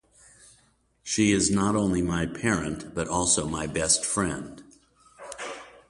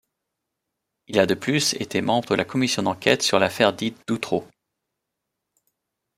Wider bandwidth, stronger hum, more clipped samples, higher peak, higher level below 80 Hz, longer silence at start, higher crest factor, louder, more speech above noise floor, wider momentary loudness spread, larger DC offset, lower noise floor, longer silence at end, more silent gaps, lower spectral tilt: second, 11.5 kHz vs 16 kHz; neither; neither; second, -8 dBFS vs -2 dBFS; first, -48 dBFS vs -62 dBFS; about the same, 1.05 s vs 1.1 s; about the same, 20 dB vs 22 dB; second, -25 LUFS vs -22 LUFS; second, 39 dB vs 59 dB; first, 15 LU vs 8 LU; neither; second, -65 dBFS vs -82 dBFS; second, 0.2 s vs 1.75 s; neither; about the same, -3.5 dB/octave vs -4 dB/octave